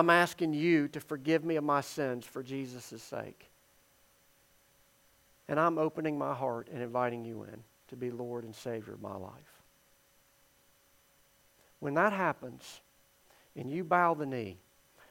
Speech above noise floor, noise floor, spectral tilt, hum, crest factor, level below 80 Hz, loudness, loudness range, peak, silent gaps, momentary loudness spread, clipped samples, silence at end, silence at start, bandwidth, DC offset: 34 dB; -67 dBFS; -6 dB/octave; none; 24 dB; -78 dBFS; -33 LUFS; 12 LU; -10 dBFS; none; 18 LU; under 0.1%; 0.55 s; 0 s; 16.5 kHz; under 0.1%